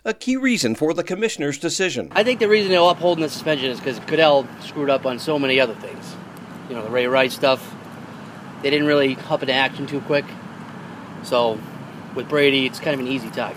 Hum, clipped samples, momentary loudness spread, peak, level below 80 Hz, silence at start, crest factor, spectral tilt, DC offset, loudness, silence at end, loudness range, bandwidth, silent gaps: none; under 0.1%; 20 LU; 0 dBFS; -64 dBFS; 0.05 s; 20 dB; -4 dB/octave; under 0.1%; -20 LUFS; 0 s; 4 LU; 16 kHz; none